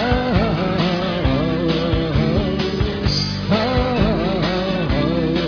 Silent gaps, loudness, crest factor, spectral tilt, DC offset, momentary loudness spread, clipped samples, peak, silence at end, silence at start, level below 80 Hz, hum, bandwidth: none; -19 LUFS; 14 dB; -7 dB/octave; under 0.1%; 2 LU; under 0.1%; -4 dBFS; 0 s; 0 s; -28 dBFS; none; 5.4 kHz